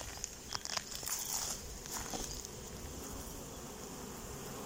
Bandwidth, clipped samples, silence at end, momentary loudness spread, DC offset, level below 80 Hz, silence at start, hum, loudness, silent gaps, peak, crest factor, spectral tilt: 16.5 kHz; under 0.1%; 0 s; 10 LU; under 0.1%; -54 dBFS; 0 s; none; -41 LUFS; none; -14 dBFS; 30 dB; -2 dB/octave